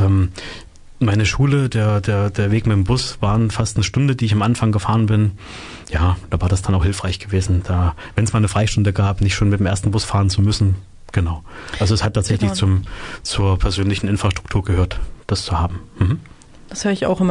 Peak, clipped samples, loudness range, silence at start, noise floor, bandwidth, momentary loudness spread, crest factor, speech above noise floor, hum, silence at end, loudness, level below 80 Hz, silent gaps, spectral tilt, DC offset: -4 dBFS; under 0.1%; 3 LU; 0 s; -37 dBFS; 11 kHz; 8 LU; 12 dB; 20 dB; none; 0 s; -19 LUFS; -32 dBFS; none; -6 dB/octave; under 0.1%